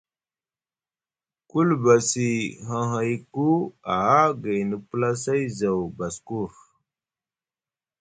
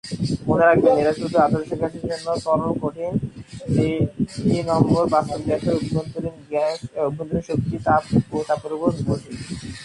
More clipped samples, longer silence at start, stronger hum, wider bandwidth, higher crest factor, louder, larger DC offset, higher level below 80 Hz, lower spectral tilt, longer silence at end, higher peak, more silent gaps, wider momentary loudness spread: neither; first, 1.55 s vs 0.05 s; neither; second, 9.6 kHz vs 11.5 kHz; about the same, 20 dB vs 20 dB; about the same, -24 LUFS vs -22 LUFS; neither; second, -60 dBFS vs -44 dBFS; second, -5.5 dB/octave vs -7 dB/octave; first, 1.55 s vs 0 s; about the same, -4 dBFS vs -2 dBFS; neither; about the same, 12 LU vs 10 LU